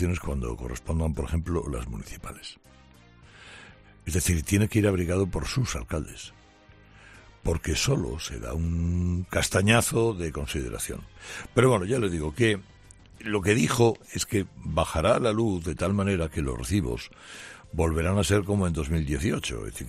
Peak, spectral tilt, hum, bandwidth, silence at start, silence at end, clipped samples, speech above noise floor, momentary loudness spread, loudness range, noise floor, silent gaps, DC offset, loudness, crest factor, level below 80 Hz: -6 dBFS; -5 dB/octave; none; 14.5 kHz; 0 s; 0 s; under 0.1%; 28 dB; 17 LU; 6 LU; -54 dBFS; none; under 0.1%; -27 LUFS; 20 dB; -40 dBFS